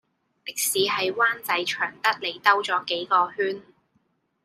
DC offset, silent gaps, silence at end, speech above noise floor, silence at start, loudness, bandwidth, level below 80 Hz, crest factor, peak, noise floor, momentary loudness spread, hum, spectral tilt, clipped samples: under 0.1%; none; 0.85 s; 45 dB; 0.45 s; -23 LUFS; 15.5 kHz; -74 dBFS; 22 dB; -4 dBFS; -69 dBFS; 8 LU; none; -1 dB/octave; under 0.1%